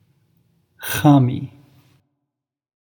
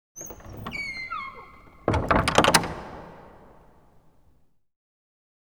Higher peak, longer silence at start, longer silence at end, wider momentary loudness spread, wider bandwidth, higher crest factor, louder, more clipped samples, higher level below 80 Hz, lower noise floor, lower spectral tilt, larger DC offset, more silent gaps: about the same, 0 dBFS vs -2 dBFS; first, 0.8 s vs 0.15 s; second, 1.5 s vs 2.25 s; second, 19 LU vs 23 LU; about the same, over 20 kHz vs over 20 kHz; second, 22 dB vs 28 dB; first, -17 LUFS vs -24 LUFS; neither; second, -58 dBFS vs -44 dBFS; first, -81 dBFS vs -63 dBFS; first, -6.5 dB/octave vs -3.5 dB/octave; second, under 0.1% vs 0.1%; neither